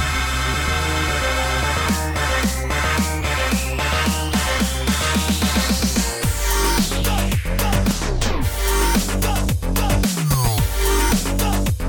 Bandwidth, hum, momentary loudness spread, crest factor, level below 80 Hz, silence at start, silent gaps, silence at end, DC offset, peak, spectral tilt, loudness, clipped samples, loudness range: 19.5 kHz; none; 3 LU; 14 dB; -24 dBFS; 0 s; none; 0 s; under 0.1%; -4 dBFS; -4 dB/octave; -20 LUFS; under 0.1%; 1 LU